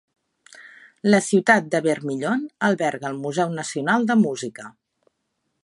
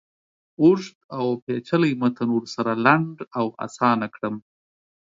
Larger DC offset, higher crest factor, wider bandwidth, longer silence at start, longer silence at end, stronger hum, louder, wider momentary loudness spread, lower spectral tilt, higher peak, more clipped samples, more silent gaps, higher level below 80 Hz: neither; about the same, 22 dB vs 22 dB; first, 11.5 kHz vs 7.6 kHz; about the same, 0.55 s vs 0.6 s; first, 0.95 s vs 0.65 s; neither; about the same, -21 LUFS vs -22 LUFS; about the same, 11 LU vs 11 LU; second, -5 dB/octave vs -7 dB/octave; about the same, -2 dBFS vs -2 dBFS; neither; second, none vs 0.95-1.09 s, 1.42-1.47 s; about the same, -72 dBFS vs -68 dBFS